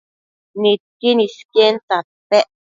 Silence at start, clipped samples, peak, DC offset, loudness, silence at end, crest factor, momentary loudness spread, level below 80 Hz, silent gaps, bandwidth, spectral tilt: 0.55 s; under 0.1%; 0 dBFS; under 0.1%; -17 LUFS; 0.35 s; 18 dB; 7 LU; -72 dBFS; 0.80-1.00 s, 1.45-1.49 s, 1.83-1.88 s, 2.04-2.30 s; 7.6 kHz; -4.5 dB/octave